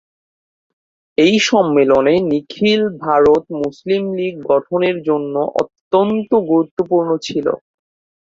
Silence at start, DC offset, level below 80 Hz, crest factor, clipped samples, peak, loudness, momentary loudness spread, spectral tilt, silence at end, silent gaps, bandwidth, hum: 1.2 s; under 0.1%; -52 dBFS; 14 dB; under 0.1%; -2 dBFS; -16 LUFS; 9 LU; -5.5 dB/octave; 0.7 s; 5.81-5.91 s, 6.71-6.77 s; 7.8 kHz; none